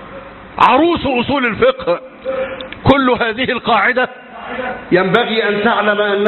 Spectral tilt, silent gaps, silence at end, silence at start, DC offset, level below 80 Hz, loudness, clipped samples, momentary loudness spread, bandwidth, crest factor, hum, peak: -7 dB/octave; none; 0 s; 0 s; under 0.1%; -42 dBFS; -14 LUFS; under 0.1%; 12 LU; 7.2 kHz; 14 dB; none; 0 dBFS